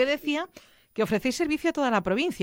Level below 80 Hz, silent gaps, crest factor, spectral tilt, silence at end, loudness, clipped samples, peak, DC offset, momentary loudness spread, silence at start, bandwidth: -56 dBFS; none; 16 dB; -4.5 dB/octave; 0 s; -26 LUFS; under 0.1%; -12 dBFS; under 0.1%; 7 LU; 0 s; 17 kHz